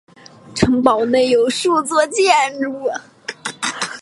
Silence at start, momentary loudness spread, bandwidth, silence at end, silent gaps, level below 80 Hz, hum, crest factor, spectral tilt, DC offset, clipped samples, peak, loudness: 0.45 s; 14 LU; 11.5 kHz; 0 s; none; -46 dBFS; none; 18 dB; -3.5 dB/octave; under 0.1%; under 0.1%; 0 dBFS; -16 LUFS